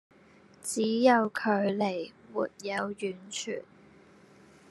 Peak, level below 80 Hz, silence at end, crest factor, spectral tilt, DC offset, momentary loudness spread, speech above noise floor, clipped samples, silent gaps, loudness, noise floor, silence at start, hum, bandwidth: -8 dBFS; -78 dBFS; 1.1 s; 22 dB; -4.5 dB/octave; under 0.1%; 14 LU; 29 dB; under 0.1%; none; -30 LUFS; -58 dBFS; 0.65 s; none; 12.5 kHz